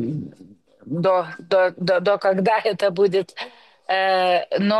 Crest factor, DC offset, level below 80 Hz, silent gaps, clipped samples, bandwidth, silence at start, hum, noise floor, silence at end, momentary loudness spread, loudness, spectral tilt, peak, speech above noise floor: 12 dB; under 0.1%; -70 dBFS; none; under 0.1%; 12 kHz; 0 s; none; -48 dBFS; 0 s; 14 LU; -20 LUFS; -6.5 dB/octave; -8 dBFS; 29 dB